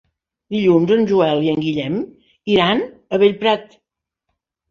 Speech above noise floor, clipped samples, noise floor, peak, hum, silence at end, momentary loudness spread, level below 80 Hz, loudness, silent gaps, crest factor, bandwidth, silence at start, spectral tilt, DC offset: 61 dB; under 0.1%; -77 dBFS; -2 dBFS; none; 1.05 s; 10 LU; -56 dBFS; -17 LUFS; none; 16 dB; 7 kHz; 0.5 s; -7 dB/octave; under 0.1%